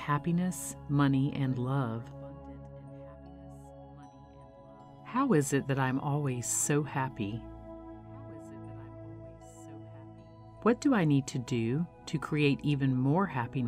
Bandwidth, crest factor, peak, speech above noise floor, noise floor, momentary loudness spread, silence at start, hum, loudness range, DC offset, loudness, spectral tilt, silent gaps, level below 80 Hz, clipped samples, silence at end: 16 kHz; 18 dB; -14 dBFS; 23 dB; -53 dBFS; 22 LU; 0 s; none; 13 LU; under 0.1%; -30 LUFS; -6 dB/octave; none; -58 dBFS; under 0.1%; 0 s